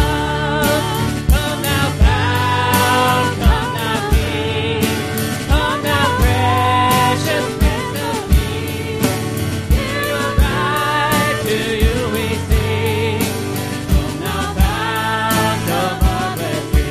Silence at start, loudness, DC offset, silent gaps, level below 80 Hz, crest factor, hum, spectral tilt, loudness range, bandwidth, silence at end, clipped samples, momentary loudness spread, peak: 0 s; -17 LUFS; 0.3%; none; -22 dBFS; 16 dB; none; -5 dB/octave; 3 LU; 15.5 kHz; 0 s; under 0.1%; 6 LU; 0 dBFS